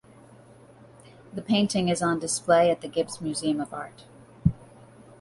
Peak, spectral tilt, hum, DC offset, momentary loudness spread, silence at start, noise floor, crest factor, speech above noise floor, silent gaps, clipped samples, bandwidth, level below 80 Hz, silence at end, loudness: -6 dBFS; -5 dB/octave; none; under 0.1%; 18 LU; 1.3 s; -52 dBFS; 20 dB; 27 dB; none; under 0.1%; 11.5 kHz; -50 dBFS; 0.55 s; -25 LUFS